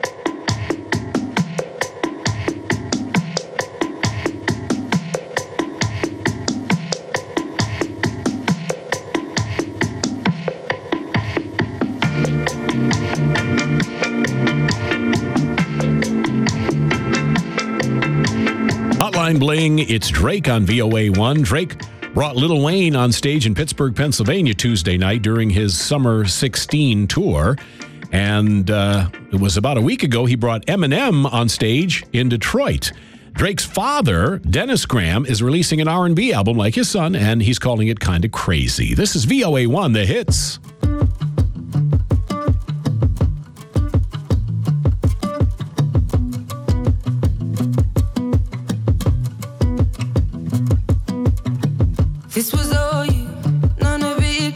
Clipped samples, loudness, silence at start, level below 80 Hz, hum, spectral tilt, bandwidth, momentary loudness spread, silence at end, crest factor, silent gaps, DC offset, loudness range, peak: under 0.1%; -18 LUFS; 0 s; -30 dBFS; none; -5.5 dB/octave; 16 kHz; 7 LU; 0 s; 18 dB; none; under 0.1%; 6 LU; 0 dBFS